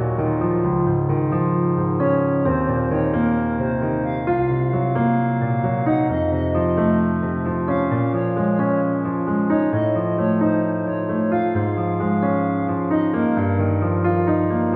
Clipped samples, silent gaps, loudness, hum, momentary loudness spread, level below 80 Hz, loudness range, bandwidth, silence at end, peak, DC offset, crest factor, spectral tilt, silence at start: under 0.1%; none; -20 LUFS; none; 3 LU; -42 dBFS; 1 LU; 3.9 kHz; 0 s; -8 dBFS; under 0.1%; 12 dB; -9 dB/octave; 0 s